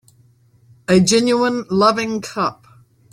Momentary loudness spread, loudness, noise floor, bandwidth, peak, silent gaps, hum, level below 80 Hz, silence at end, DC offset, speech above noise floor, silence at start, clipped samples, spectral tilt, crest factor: 10 LU; -17 LUFS; -53 dBFS; 14.5 kHz; -2 dBFS; none; none; -54 dBFS; 0.6 s; under 0.1%; 37 dB; 0.9 s; under 0.1%; -4.5 dB/octave; 16 dB